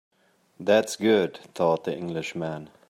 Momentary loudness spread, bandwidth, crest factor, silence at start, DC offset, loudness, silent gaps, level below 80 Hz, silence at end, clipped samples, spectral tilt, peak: 10 LU; 16 kHz; 20 dB; 0.6 s; under 0.1%; -26 LUFS; none; -70 dBFS; 0.25 s; under 0.1%; -5 dB/octave; -6 dBFS